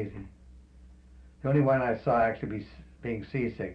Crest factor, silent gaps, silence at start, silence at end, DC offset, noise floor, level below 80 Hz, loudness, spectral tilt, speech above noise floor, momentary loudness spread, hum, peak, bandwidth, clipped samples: 16 dB; none; 0 s; 0 s; under 0.1%; -53 dBFS; -52 dBFS; -29 LUFS; -10 dB/octave; 25 dB; 18 LU; none; -14 dBFS; 5.6 kHz; under 0.1%